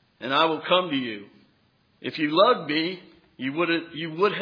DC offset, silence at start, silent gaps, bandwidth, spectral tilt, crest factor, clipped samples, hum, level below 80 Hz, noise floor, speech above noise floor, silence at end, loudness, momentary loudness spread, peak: under 0.1%; 0.2 s; none; 5.2 kHz; -7 dB/octave; 20 dB; under 0.1%; none; -78 dBFS; -64 dBFS; 40 dB; 0 s; -24 LUFS; 14 LU; -6 dBFS